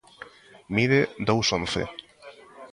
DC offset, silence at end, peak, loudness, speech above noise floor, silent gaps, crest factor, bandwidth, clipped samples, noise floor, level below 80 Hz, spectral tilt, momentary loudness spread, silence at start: under 0.1%; 0.05 s; -8 dBFS; -24 LUFS; 25 dB; none; 20 dB; 11.5 kHz; under 0.1%; -49 dBFS; -52 dBFS; -4.5 dB/octave; 23 LU; 0.2 s